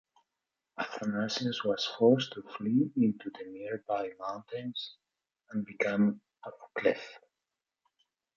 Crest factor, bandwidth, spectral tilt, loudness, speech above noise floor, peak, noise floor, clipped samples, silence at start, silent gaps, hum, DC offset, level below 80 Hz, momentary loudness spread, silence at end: 22 dB; 7.4 kHz; -6 dB/octave; -32 LUFS; 58 dB; -12 dBFS; -89 dBFS; under 0.1%; 0.8 s; none; none; under 0.1%; -76 dBFS; 16 LU; 1.2 s